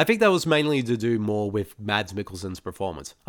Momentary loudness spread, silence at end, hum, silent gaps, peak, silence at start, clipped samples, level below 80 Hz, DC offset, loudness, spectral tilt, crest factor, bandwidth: 14 LU; 0.15 s; none; none; -4 dBFS; 0 s; under 0.1%; -56 dBFS; under 0.1%; -25 LUFS; -5.5 dB/octave; 20 dB; 19 kHz